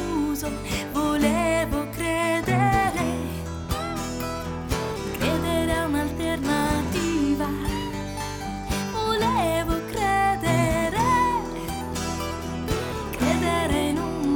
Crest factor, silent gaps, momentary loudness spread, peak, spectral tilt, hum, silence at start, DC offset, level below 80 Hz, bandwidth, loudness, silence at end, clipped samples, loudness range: 16 dB; none; 8 LU; -8 dBFS; -5 dB/octave; none; 0 s; under 0.1%; -38 dBFS; 19 kHz; -25 LUFS; 0 s; under 0.1%; 3 LU